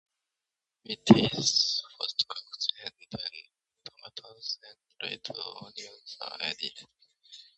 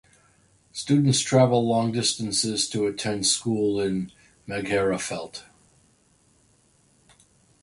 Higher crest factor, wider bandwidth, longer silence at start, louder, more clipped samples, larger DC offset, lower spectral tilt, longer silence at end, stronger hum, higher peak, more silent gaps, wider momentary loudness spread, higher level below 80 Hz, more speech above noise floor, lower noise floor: first, 30 dB vs 20 dB; second, 8.4 kHz vs 11.5 kHz; first, 0.9 s vs 0.75 s; second, -29 LUFS vs -24 LUFS; neither; neither; about the same, -4 dB/octave vs -4.5 dB/octave; second, 0.15 s vs 2.2 s; neither; first, -2 dBFS vs -6 dBFS; neither; first, 23 LU vs 15 LU; second, -64 dBFS vs -58 dBFS; first, 61 dB vs 38 dB; first, -89 dBFS vs -62 dBFS